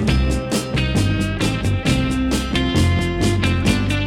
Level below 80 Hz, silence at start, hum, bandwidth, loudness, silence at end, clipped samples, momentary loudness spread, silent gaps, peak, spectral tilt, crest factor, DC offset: -26 dBFS; 0 s; none; 16 kHz; -19 LUFS; 0 s; under 0.1%; 3 LU; none; -4 dBFS; -5.5 dB/octave; 14 dB; under 0.1%